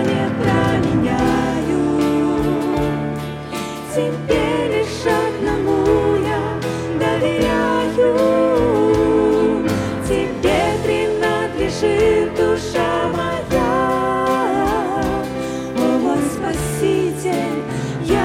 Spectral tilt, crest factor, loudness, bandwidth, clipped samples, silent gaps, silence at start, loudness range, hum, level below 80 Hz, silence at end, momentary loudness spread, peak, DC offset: -6 dB/octave; 14 dB; -18 LUFS; 16 kHz; under 0.1%; none; 0 s; 3 LU; none; -38 dBFS; 0 s; 7 LU; -4 dBFS; under 0.1%